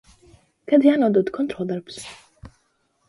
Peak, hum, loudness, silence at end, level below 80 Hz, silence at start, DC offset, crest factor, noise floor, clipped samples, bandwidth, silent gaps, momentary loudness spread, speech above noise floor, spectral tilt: -4 dBFS; none; -20 LUFS; 0.6 s; -58 dBFS; 0.7 s; under 0.1%; 18 dB; -67 dBFS; under 0.1%; 11.5 kHz; none; 20 LU; 48 dB; -6.5 dB/octave